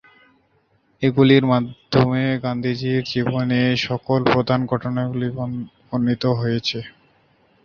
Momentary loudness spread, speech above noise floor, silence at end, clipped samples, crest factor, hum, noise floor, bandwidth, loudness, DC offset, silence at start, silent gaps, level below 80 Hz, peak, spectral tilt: 10 LU; 43 dB; 0.75 s; under 0.1%; 18 dB; none; -62 dBFS; 7 kHz; -20 LUFS; under 0.1%; 1 s; none; -52 dBFS; -2 dBFS; -7.5 dB/octave